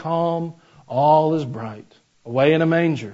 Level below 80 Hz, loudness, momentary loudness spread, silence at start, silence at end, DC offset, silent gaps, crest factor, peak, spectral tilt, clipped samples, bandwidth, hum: -66 dBFS; -19 LUFS; 16 LU; 0 s; 0 s; under 0.1%; none; 16 dB; -4 dBFS; -8 dB/octave; under 0.1%; 7.8 kHz; none